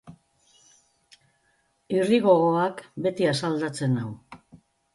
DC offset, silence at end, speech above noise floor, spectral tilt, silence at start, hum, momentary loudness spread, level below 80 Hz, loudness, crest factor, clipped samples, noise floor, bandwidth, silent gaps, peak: under 0.1%; 0.4 s; 45 dB; -6.5 dB/octave; 0.05 s; none; 10 LU; -68 dBFS; -24 LUFS; 20 dB; under 0.1%; -69 dBFS; 11.5 kHz; none; -6 dBFS